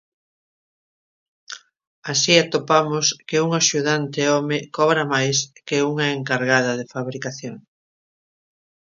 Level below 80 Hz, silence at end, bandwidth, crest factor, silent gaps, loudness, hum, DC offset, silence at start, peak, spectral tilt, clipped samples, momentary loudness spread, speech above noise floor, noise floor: -68 dBFS; 1.25 s; 7.6 kHz; 22 dB; 1.87-2.02 s; -20 LUFS; none; under 0.1%; 1.5 s; 0 dBFS; -3 dB/octave; under 0.1%; 17 LU; over 70 dB; under -90 dBFS